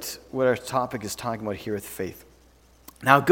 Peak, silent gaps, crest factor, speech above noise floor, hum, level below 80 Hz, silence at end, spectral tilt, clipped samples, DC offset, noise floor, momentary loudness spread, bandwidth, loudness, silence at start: 0 dBFS; none; 26 dB; 32 dB; none; -58 dBFS; 0 s; -4.5 dB/octave; under 0.1%; under 0.1%; -56 dBFS; 13 LU; 19 kHz; -27 LUFS; 0 s